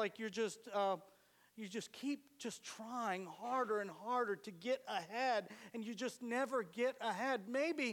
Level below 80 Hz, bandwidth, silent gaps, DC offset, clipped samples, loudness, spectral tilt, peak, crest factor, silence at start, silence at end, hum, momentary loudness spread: under -90 dBFS; 18 kHz; none; under 0.1%; under 0.1%; -41 LUFS; -3.5 dB/octave; -26 dBFS; 16 dB; 0 s; 0 s; none; 9 LU